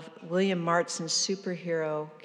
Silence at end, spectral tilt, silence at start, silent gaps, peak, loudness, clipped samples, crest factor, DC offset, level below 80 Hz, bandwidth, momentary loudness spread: 0.05 s; -3.5 dB/octave; 0 s; none; -14 dBFS; -29 LUFS; under 0.1%; 16 dB; under 0.1%; under -90 dBFS; 11.5 kHz; 6 LU